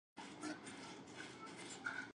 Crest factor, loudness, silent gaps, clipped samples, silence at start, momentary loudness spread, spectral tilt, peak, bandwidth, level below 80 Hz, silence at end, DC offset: 20 dB; -51 LUFS; none; under 0.1%; 0.15 s; 7 LU; -3 dB/octave; -32 dBFS; 11 kHz; -82 dBFS; 0.05 s; under 0.1%